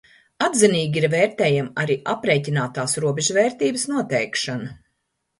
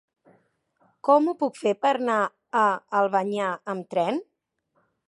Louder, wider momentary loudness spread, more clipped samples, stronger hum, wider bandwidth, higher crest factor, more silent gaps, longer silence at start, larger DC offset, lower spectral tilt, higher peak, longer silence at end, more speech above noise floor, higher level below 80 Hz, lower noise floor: first, -21 LUFS vs -24 LUFS; about the same, 7 LU vs 8 LU; neither; neither; about the same, 11.5 kHz vs 11.5 kHz; about the same, 20 dB vs 18 dB; neither; second, 0.4 s vs 1.05 s; neither; second, -4 dB/octave vs -5.5 dB/octave; first, -2 dBFS vs -8 dBFS; second, 0.65 s vs 0.85 s; first, 54 dB vs 50 dB; first, -62 dBFS vs -82 dBFS; about the same, -74 dBFS vs -73 dBFS